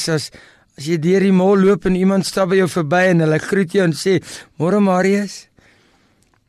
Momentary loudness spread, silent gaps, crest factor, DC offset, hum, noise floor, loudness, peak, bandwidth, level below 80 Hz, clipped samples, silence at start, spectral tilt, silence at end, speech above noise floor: 9 LU; none; 10 dB; under 0.1%; none; -58 dBFS; -16 LUFS; -6 dBFS; 13 kHz; -48 dBFS; under 0.1%; 0 s; -6 dB/octave; 1.05 s; 42 dB